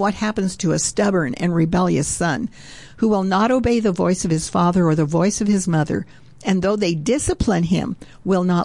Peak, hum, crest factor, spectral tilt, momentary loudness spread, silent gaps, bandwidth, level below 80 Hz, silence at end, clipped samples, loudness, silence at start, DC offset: -8 dBFS; none; 12 dB; -5.5 dB/octave; 8 LU; none; 11.5 kHz; -40 dBFS; 0 s; under 0.1%; -19 LUFS; 0 s; 0.4%